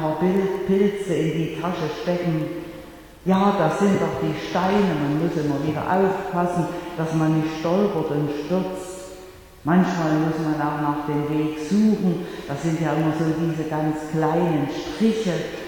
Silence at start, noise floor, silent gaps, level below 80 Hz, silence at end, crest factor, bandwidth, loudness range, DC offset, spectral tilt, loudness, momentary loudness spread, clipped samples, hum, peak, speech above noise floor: 0 s; -43 dBFS; none; -50 dBFS; 0 s; 16 dB; 19 kHz; 2 LU; under 0.1%; -7 dB/octave; -22 LUFS; 8 LU; under 0.1%; none; -6 dBFS; 21 dB